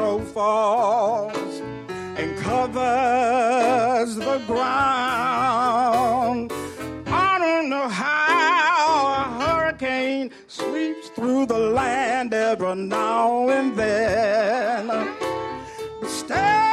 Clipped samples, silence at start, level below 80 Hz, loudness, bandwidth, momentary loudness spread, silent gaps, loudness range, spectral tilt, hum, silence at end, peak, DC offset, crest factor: under 0.1%; 0 s; -52 dBFS; -21 LUFS; 14.5 kHz; 11 LU; none; 3 LU; -4.5 dB/octave; none; 0 s; -8 dBFS; under 0.1%; 12 dB